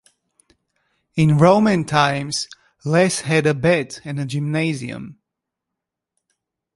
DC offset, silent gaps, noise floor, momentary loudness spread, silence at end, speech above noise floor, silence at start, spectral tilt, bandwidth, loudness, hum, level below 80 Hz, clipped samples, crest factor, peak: under 0.1%; none; -83 dBFS; 17 LU; 1.65 s; 65 dB; 1.15 s; -5.5 dB/octave; 11.5 kHz; -18 LUFS; none; -54 dBFS; under 0.1%; 18 dB; -2 dBFS